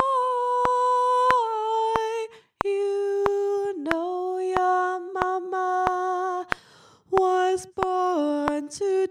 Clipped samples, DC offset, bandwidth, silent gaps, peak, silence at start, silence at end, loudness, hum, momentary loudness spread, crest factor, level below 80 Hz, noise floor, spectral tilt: under 0.1%; under 0.1%; 11 kHz; none; 0 dBFS; 0 s; 0 s; -25 LUFS; none; 7 LU; 24 dB; -56 dBFS; -54 dBFS; -4.5 dB/octave